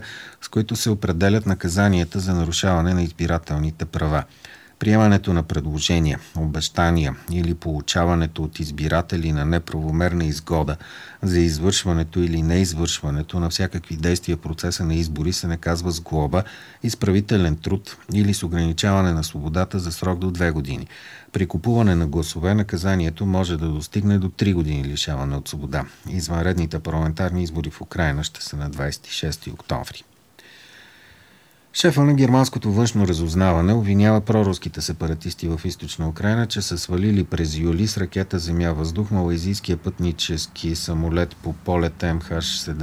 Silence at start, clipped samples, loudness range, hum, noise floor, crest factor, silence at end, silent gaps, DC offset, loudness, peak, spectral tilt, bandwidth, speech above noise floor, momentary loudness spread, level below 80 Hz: 0 s; under 0.1%; 5 LU; none; -53 dBFS; 18 dB; 0 s; none; under 0.1%; -22 LUFS; -4 dBFS; -5.5 dB/octave; over 20 kHz; 32 dB; 9 LU; -34 dBFS